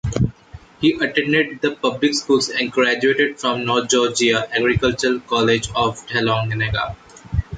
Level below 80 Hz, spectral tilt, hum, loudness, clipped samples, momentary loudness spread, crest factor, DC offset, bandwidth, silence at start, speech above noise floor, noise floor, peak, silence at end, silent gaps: -38 dBFS; -4.5 dB/octave; none; -19 LUFS; under 0.1%; 5 LU; 14 dB; under 0.1%; 9.6 kHz; 0.05 s; 24 dB; -42 dBFS; -4 dBFS; 0 s; none